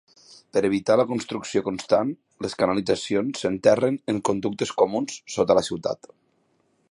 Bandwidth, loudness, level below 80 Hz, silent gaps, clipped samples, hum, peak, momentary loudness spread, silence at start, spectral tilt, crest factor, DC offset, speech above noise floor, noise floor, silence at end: 11.5 kHz; -24 LUFS; -60 dBFS; none; under 0.1%; none; -4 dBFS; 9 LU; 0.3 s; -5 dB/octave; 20 dB; under 0.1%; 44 dB; -67 dBFS; 0.95 s